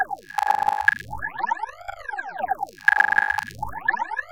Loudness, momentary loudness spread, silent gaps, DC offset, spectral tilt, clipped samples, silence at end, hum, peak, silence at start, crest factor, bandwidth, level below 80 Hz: -23 LUFS; 14 LU; none; under 0.1%; -2.5 dB/octave; under 0.1%; 0 s; none; -2 dBFS; 0 s; 22 dB; 17 kHz; -52 dBFS